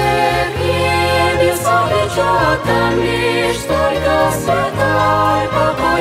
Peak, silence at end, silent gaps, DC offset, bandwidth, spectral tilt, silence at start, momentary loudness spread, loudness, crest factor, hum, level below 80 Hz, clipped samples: -2 dBFS; 0 s; none; under 0.1%; 16 kHz; -5 dB/octave; 0 s; 3 LU; -14 LUFS; 12 dB; none; -32 dBFS; under 0.1%